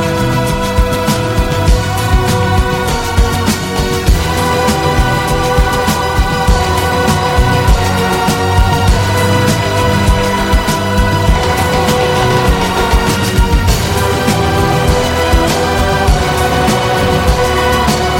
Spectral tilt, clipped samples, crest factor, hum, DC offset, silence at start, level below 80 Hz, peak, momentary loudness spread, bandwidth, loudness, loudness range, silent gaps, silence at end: -5 dB/octave; under 0.1%; 10 dB; none; under 0.1%; 0 s; -16 dBFS; 0 dBFS; 2 LU; 17 kHz; -12 LUFS; 1 LU; none; 0 s